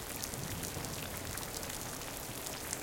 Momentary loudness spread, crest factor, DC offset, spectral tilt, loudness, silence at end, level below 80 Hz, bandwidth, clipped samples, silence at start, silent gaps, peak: 2 LU; 28 dB; under 0.1%; -2.5 dB/octave; -40 LUFS; 0 s; -54 dBFS; 17 kHz; under 0.1%; 0 s; none; -14 dBFS